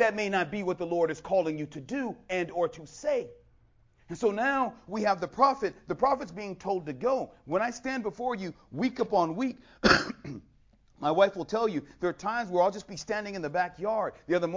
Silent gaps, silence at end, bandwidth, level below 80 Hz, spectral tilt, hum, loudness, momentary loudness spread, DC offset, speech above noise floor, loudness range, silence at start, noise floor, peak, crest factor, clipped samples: none; 0 s; 7.6 kHz; -58 dBFS; -5 dB/octave; none; -30 LUFS; 10 LU; under 0.1%; 33 dB; 4 LU; 0 s; -63 dBFS; -6 dBFS; 24 dB; under 0.1%